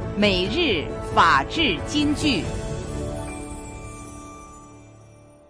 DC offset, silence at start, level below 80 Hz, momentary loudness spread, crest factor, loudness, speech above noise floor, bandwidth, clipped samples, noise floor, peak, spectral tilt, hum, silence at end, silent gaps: under 0.1%; 0 s; -38 dBFS; 21 LU; 18 dB; -22 LUFS; 28 dB; 10.5 kHz; under 0.1%; -48 dBFS; -6 dBFS; -4.5 dB/octave; none; 0.35 s; none